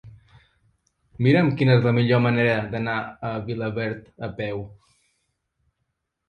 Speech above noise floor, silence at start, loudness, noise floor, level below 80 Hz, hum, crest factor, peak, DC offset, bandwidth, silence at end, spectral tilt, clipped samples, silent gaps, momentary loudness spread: 56 dB; 0.05 s; -22 LUFS; -77 dBFS; -56 dBFS; none; 18 dB; -6 dBFS; under 0.1%; 5.2 kHz; 1.55 s; -9 dB/octave; under 0.1%; none; 13 LU